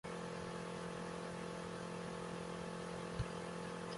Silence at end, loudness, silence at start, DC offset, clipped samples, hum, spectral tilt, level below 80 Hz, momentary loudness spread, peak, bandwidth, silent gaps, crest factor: 0 s; -46 LUFS; 0.05 s; under 0.1%; under 0.1%; none; -5 dB/octave; -62 dBFS; 2 LU; -28 dBFS; 11.5 kHz; none; 16 dB